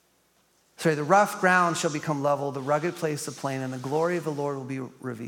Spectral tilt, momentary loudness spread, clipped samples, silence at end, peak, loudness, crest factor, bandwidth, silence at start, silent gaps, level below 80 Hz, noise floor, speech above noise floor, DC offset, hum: -5 dB/octave; 11 LU; under 0.1%; 0 s; -6 dBFS; -26 LUFS; 20 dB; 17.5 kHz; 0.8 s; none; -78 dBFS; -66 dBFS; 40 dB; under 0.1%; none